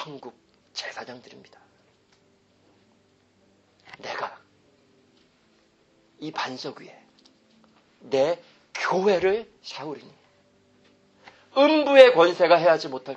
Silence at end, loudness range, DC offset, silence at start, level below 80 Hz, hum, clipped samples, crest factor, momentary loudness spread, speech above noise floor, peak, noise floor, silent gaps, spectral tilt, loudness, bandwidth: 0 s; 21 LU; under 0.1%; 0 s; -70 dBFS; none; under 0.1%; 24 dB; 25 LU; 41 dB; 0 dBFS; -63 dBFS; none; -4.5 dB/octave; -21 LUFS; 8 kHz